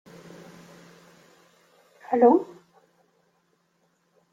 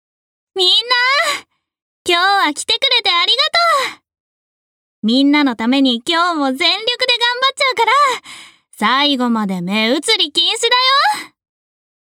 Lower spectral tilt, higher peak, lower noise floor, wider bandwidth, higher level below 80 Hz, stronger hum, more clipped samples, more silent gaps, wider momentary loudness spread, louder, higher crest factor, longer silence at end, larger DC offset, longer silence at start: first, -7.5 dB/octave vs -2.5 dB/octave; second, -8 dBFS vs -2 dBFS; second, -69 dBFS vs under -90 dBFS; second, 7.6 kHz vs 16.5 kHz; second, -78 dBFS vs -68 dBFS; neither; neither; second, none vs 1.82-2.05 s, 4.20-5.02 s; first, 28 LU vs 7 LU; second, -21 LUFS vs -13 LUFS; first, 22 dB vs 14 dB; first, 1.9 s vs 0.9 s; neither; first, 2.1 s vs 0.55 s